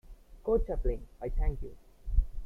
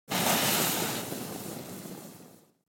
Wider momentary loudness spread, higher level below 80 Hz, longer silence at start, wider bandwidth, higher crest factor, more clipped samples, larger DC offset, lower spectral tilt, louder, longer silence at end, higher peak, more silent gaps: second, 14 LU vs 19 LU; first, -34 dBFS vs -70 dBFS; about the same, 0.05 s vs 0.1 s; second, 2.6 kHz vs 17 kHz; about the same, 18 dB vs 20 dB; neither; neither; first, -10 dB/octave vs -2.5 dB/octave; second, -35 LUFS vs -28 LUFS; second, 0 s vs 0.35 s; about the same, -12 dBFS vs -12 dBFS; neither